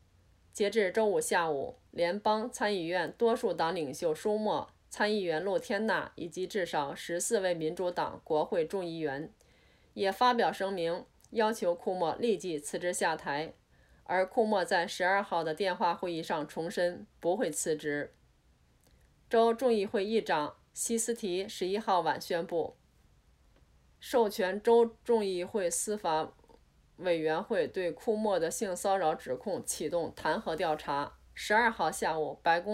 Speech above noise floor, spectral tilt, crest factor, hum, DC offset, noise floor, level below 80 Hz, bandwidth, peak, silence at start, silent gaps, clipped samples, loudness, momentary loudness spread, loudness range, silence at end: 35 dB; -3.5 dB/octave; 18 dB; none; under 0.1%; -66 dBFS; -66 dBFS; 16 kHz; -14 dBFS; 0.55 s; none; under 0.1%; -32 LUFS; 8 LU; 3 LU; 0 s